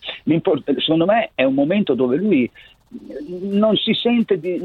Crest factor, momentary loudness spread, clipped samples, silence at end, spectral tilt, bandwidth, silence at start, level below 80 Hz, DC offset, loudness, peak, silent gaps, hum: 14 dB; 9 LU; under 0.1%; 0 s; -8.5 dB/octave; 4.7 kHz; 0.05 s; -58 dBFS; under 0.1%; -18 LUFS; -4 dBFS; none; none